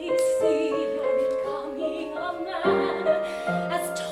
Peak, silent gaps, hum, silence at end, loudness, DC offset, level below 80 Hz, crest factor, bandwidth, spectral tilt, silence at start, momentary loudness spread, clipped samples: -10 dBFS; none; none; 0 s; -26 LUFS; under 0.1%; -62 dBFS; 16 dB; 15.5 kHz; -5 dB/octave; 0 s; 7 LU; under 0.1%